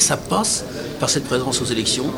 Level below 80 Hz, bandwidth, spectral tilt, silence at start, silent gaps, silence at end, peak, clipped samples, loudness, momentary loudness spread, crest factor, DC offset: -44 dBFS; over 20 kHz; -3 dB/octave; 0 s; none; 0 s; -2 dBFS; under 0.1%; -20 LUFS; 4 LU; 18 dB; under 0.1%